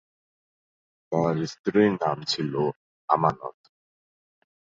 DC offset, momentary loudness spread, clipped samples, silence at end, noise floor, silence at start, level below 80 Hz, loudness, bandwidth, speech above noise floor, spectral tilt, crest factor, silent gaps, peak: under 0.1%; 11 LU; under 0.1%; 1.25 s; under -90 dBFS; 1.1 s; -62 dBFS; -25 LUFS; 7.8 kHz; over 66 dB; -6 dB/octave; 24 dB; 1.59-1.64 s, 2.76-3.08 s; -4 dBFS